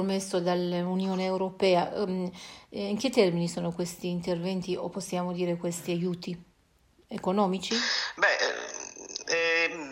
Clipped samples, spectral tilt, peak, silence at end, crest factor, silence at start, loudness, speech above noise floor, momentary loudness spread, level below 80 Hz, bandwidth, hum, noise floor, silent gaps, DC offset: under 0.1%; -4.5 dB/octave; -10 dBFS; 0 s; 18 dB; 0 s; -29 LUFS; 36 dB; 12 LU; -66 dBFS; 16 kHz; none; -65 dBFS; none; under 0.1%